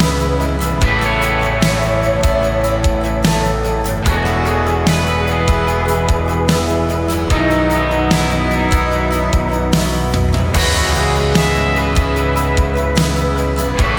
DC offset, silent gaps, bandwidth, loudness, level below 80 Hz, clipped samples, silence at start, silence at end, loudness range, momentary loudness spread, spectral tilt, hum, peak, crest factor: under 0.1%; none; over 20 kHz; -15 LUFS; -20 dBFS; under 0.1%; 0 s; 0 s; 1 LU; 3 LU; -5 dB/octave; none; 0 dBFS; 14 dB